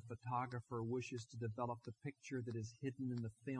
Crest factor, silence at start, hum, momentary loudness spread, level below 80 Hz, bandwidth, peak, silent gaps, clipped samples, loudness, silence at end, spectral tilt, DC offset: 16 dB; 0 s; none; 5 LU; -80 dBFS; 10 kHz; -28 dBFS; none; under 0.1%; -46 LUFS; 0 s; -7 dB/octave; under 0.1%